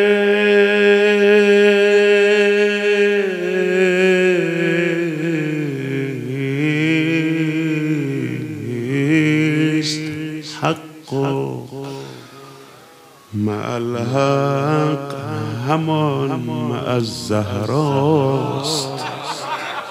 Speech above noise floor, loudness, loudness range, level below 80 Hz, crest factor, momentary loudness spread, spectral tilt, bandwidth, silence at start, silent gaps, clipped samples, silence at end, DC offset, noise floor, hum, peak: 27 dB; -17 LUFS; 10 LU; -66 dBFS; 16 dB; 12 LU; -6 dB/octave; 15 kHz; 0 s; none; under 0.1%; 0 s; under 0.1%; -44 dBFS; none; 0 dBFS